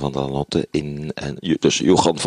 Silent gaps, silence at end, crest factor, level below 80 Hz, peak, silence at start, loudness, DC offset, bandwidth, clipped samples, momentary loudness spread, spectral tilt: none; 0 s; 18 dB; -44 dBFS; -2 dBFS; 0 s; -20 LUFS; under 0.1%; 11 kHz; under 0.1%; 12 LU; -5 dB/octave